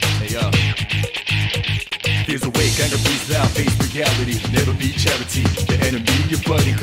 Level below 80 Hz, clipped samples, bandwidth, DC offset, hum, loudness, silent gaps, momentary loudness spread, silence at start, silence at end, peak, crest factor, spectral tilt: -32 dBFS; under 0.1%; 16.5 kHz; under 0.1%; none; -18 LUFS; none; 3 LU; 0 s; 0 s; -2 dBFS; 16 dB; -4 dB/octave